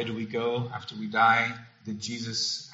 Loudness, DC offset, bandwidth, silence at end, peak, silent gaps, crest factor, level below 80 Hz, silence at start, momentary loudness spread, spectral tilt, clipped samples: -27 LUFS; under 0.1%; 8 kHz; 0 s; -10 dBFS; none; 20 dB; -70 dBFS; 0 s; 14 LU; -2 dB/octave; under 0.1%